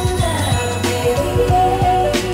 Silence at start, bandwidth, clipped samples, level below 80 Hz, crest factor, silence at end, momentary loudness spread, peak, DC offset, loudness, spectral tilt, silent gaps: 0 s; 16 kHz; under 0.1%; -28 dBFS; 12 dB; 0 s; 3 LU; -4 dBFS; under 0.1%; -16 LUFS; -5 dB/octave; none